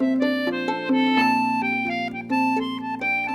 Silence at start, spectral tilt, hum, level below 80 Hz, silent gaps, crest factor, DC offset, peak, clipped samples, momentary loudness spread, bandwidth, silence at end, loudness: 0 s; -5 dB/octave; none; -66 dBFS; none; 14 dB; under 0.1%; -8 dBFS; under 0.1%; 7 LU; 12.5 kHz; 0 s; -22 LUFS